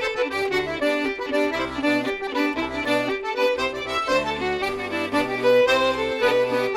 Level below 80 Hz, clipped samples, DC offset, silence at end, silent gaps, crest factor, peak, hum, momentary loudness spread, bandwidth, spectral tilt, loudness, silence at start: -50 dBFS; under 0.1%; under 0.1%; 0 s; none; 14 dB; -8 dBFS; none; 6 LU; 14.5 kHz; -4 dB/octave; -22 LUFS; 0 s